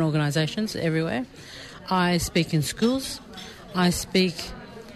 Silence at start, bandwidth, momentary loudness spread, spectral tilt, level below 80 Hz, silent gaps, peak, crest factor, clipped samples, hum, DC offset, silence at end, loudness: 0 s; 13.5 kHz; 17 LU; -5 dB/octave; -48 dBFS; none; -10 dBFS; 14 dB; under 0.1%; none; under 0.1%; 0 s; -25 LUFS